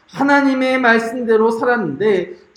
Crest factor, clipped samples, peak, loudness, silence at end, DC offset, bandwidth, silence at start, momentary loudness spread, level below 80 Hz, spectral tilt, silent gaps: 16 dB; under 0.1%; 0 dBFS; -15 LUFS; 0.2 s; under 0.1%; 12 kHz; 0.15 s; 4 LU; -62 dBFS; -5.5 dB/octave; none